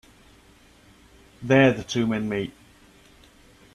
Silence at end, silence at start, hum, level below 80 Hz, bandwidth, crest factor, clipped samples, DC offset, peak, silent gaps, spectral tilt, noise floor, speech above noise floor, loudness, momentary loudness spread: 1.25 s; 1.4 s; none; -56 dBFS; 12.5 kHz; 24 dB; under 0.1%; under 0.1%; -4 dBFS; none; -6 dB/octave; -54 dBFS; 33 dB; -22 LUFS; 16 LU